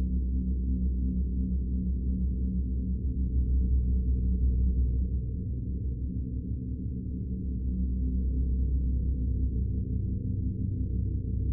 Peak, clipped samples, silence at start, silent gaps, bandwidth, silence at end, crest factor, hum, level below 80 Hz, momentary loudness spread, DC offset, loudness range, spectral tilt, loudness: -18 dBFS; under 0.1%; 0 s; none; 0.6 kHz; 0 s; 10 dB; none; -30 dBFS; 6 LU; under 0.1%; 3 LU; -19.5 dB/octave; -31 LUFS